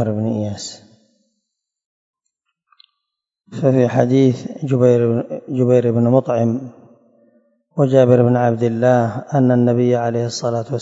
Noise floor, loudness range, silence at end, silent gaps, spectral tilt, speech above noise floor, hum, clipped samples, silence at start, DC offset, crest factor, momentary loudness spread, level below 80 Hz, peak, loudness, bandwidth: -80 dBFS; 8 LU; 0 s; 1.86-2.14 s; -7.5 dB/octave; 65 dB; none; under 0.1%; 0 s; under 0.1%; 18 dB; 11 LU; -64 dBFS; 0 dBFS; -16 LUFS; 7.8 kHz